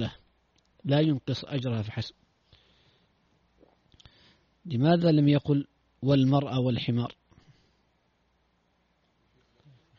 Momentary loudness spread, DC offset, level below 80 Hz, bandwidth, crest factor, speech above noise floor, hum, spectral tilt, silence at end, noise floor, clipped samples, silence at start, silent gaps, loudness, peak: 15 LU; under 0.1%; -62 dBFS; 6.8 kHz; 20 dB; 46 dB; none; -7 dB/octave; 2.9 s; -71 dBFS; under 0.1%; 0 s; none; -27 LUFS; -8 dBFS